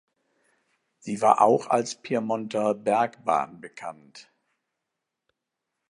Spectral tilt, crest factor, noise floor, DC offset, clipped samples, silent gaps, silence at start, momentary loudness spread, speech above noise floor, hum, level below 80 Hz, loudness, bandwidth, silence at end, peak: -5 dB/octave; 24 dB; -84 dBFS; under 0.1%; under 0.1%; none; 1.05 s; 19 LU; 59 dB; none; -76 dBFS; -24 LUFS; 11 kHz; 1.7 s; -2 dBFS